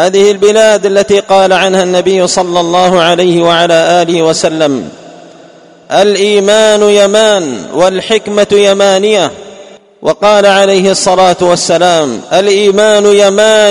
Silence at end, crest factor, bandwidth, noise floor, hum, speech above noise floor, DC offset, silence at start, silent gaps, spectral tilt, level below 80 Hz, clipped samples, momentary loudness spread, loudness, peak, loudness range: 0 s; 8 dB; 11 kHz; -36 dBFS; none; 29 dB; under 0.1%; 0 s; none; -3.5 dB/octave; -48 dBFS; 2%; 5 LU; -7 LUFS; 0 dBFS; 3 LU